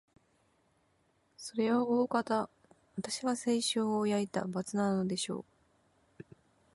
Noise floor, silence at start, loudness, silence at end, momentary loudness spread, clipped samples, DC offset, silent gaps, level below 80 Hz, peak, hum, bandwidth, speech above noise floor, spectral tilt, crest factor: -73 dBFS; 1.4 s; -33 LUFS; 1.35 s; 13 LU; under 0.1%; under 0.1%; none; -74 dBFS; -18 dBFS; none; 11.5 kHz; 41 dB; -4.5 dB/octave; 18 dB